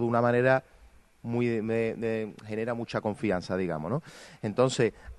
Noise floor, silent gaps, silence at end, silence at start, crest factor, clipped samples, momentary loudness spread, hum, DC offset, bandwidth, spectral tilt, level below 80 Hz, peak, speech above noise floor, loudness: -56 dBFS; none; 0.05 s; 0 s; 20 dB; under 0.1%; 10 LU; none; under 0.1%; 12 kHz; -6.5 dB/octave; -58 dBFS; -10 dBFS; 28 dB; -29 LUFS